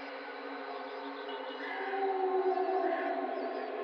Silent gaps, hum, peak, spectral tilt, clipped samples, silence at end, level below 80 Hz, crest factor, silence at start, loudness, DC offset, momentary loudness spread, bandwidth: none; none; -20 dBFS; -4.5 dB/octave; under 0.1%; 0 s; under -90 dBFS; 14 dB; 0 s; -35 LUFS; under 0.1%; 10 LU; 5.8 kHz